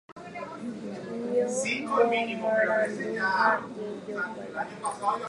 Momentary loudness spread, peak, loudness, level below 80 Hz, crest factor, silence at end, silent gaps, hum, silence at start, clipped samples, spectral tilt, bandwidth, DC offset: 13 LU; -10 dBFS; -28 LUFS; -72 dBFS; 20 dB; 0 s; 0.12-0.16 s; none; 0.1 s; under 0.1%; -4 dB/octave; 11.5 kHz; under 0.1%